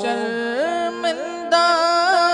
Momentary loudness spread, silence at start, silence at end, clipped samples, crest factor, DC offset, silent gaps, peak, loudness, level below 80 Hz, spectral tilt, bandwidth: 8 LU; 0 s; 0 s; under 0.1%; 14 dB; under 0.1%; none; -4 dBFS; -19 LUFS; -66 dBFS; -2 dB/octave; 11 kHz